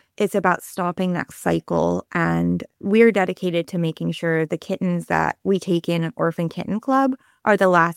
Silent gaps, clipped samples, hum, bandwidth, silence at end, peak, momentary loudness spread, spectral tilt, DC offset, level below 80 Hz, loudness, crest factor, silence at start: none; under 0.1%; none; 15 kHz; 0.05 s; -2 dBFS; 9 LU; -6.5 dB/octave; under 0.1%; -56 dBFS; -21 LUFS; 18 dB; 0.2 s